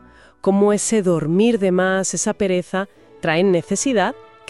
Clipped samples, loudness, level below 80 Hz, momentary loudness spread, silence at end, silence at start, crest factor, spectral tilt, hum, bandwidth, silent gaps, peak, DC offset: under 0.1%; -19 LUFS; -56 dBFS; 8 LU; 0.3 s; 0.45 s; 14 dB; -4.5 dB/octave; none; 12 kHz; none; -4 dBFS; 0.3%